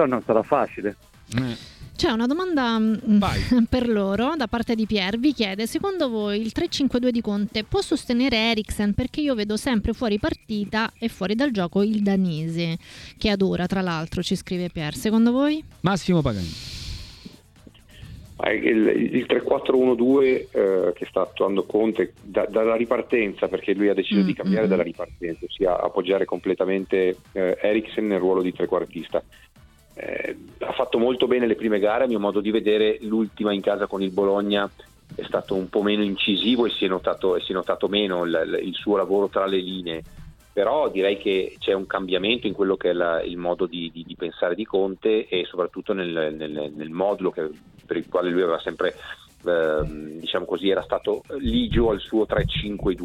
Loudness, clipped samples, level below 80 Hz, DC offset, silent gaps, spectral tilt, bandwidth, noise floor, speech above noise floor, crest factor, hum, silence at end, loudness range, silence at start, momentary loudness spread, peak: -23 LUFS; under 0.1%; -44 dBFS; under 0.1%; none; -6 dB/octave; 14.5 kHz; -50 dBFS; 27 dB; 18 dB; none; 0 s; 4 LU; 0 s; 10 LU; -4 dBFS